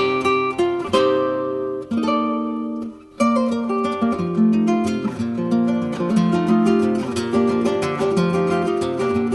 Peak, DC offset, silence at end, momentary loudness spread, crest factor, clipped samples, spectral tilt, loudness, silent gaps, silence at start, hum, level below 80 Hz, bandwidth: -4 dBFS; under 0.1%; 0 s; 7 LU; 16 dB; under 0.1%; -6.5 dB/octave; -20 LUFS; none; 0 s; none; -56 dBFS; 11.5 kHz